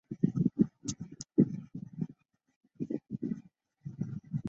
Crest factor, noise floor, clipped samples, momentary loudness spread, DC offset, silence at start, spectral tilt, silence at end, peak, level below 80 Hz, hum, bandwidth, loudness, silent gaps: 24 dB; -60 dBFS; under 0.1%; 14 LU; under 0.1%; 0.1 s; -7.5 dB/octave; 0 s; -10 dBFS; -66 dBFS; none; 8.2 kHz; -35 LUFS; 2.56-2.61 s